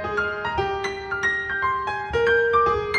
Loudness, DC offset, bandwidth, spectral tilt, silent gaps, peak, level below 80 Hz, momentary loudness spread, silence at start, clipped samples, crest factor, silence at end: -22 LUFS; under 0.1%; 9.4 kHz; -4.5 dB/octave; none; -8 dBFS; -44 dBFS; 7 LU; 0 s; under 0.1%; 14 dB; 0 s